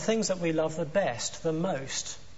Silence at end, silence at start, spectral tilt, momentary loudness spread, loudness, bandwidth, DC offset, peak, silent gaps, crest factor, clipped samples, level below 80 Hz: 0.1 s; 0 s; -4 dB/octave; 4 LU; -30 LUFS; 8.2 kHz; 0.7%; -12 dBFS; none; 18 dB; under 0.1%; -58 dBFS